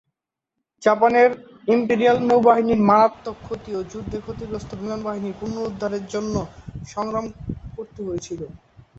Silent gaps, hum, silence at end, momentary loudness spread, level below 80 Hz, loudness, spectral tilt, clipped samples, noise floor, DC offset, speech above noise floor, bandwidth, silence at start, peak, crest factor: none; none; 0.4 s; 18 LU; -48 dBFS; -21 LUFS; -6.5 dB/octave; under 0.1%; -82 dBFS; under 0.1%; 62 dB; 8 kHz; 0.8 s; -4 dBFS; 18 dB